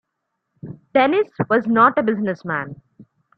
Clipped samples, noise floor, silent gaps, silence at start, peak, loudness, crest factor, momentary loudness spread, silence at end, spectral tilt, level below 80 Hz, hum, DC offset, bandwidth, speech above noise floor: under 0.1%; -77 dBFS; none; 0.65 s; -2 dBFS; -18 LUFS; 18 dB; 18 LU; 0.65 s; -8.5 dB/octave; -62 dBFS; none; under 0.1%; 6 kHz; 59 dB